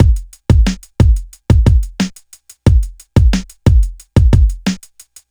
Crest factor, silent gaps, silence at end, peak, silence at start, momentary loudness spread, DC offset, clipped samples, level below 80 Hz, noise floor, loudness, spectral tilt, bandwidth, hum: 12 dB; none; 0.55 s; 0 dBFS; 0 s; 9 LU; under 0.1%; under 0.1%; -14 dBFS; -42 dBFS; -14 LUFS; -7 dB/octave; 12 kHz; none